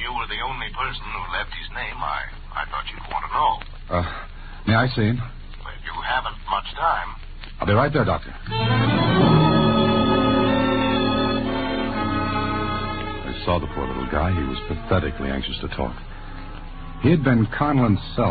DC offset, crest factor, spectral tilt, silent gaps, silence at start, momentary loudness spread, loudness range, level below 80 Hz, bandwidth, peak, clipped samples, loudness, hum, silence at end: under 0.1%; 18 dB; -11.5 dB/octave; none; 0 s; 13 LU; 8 LU; -34 dBFS; 4.8 kHz; -4 dBFS; under 0.1%; -22 LUFS; none; 0 s